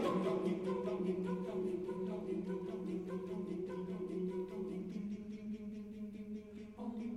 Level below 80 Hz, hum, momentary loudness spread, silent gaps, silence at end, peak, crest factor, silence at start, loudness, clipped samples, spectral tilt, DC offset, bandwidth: -68 dBFS; none; 10 LU; none; 0 s; -24 dBFS; 16 dB; 0 s; -42 LUFS; under 0.1%; -8 dB/octave; under 0.1%; 12 kHz